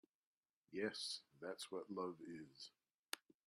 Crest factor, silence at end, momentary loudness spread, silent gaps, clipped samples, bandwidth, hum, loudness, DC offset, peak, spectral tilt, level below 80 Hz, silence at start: 24 dB; 0.3 s; 12 LU; 2.95-3.03 s; under 0.1%; 14 kHz; none; -50 LUFS; under 0.1%; -28 dBFS; -3 dB/octave; under -90 dBFS; 0.7 s